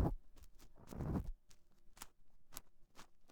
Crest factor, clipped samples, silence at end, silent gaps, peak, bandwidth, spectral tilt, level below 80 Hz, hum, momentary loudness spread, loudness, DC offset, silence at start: 24 dB; under 0.1%; 0 s; none; -22 dBFS; over 20 kHz; -7 dB/octave; -52 dBFS; none; 22 LU; -49 LUFS; under 0.1%; 0 s